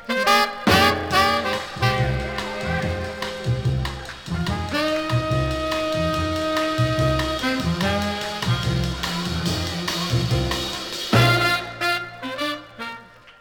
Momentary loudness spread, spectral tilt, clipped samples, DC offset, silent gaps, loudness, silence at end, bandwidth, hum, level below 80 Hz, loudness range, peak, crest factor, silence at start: 10 LU; -5 dB/octave; under 0.1%; under 0.1%; none; -22 LUFS; 0.1 s; 20 kHz; none; -38 dBFS; 4 LU; -2 dBFS; 20 dB; 0 s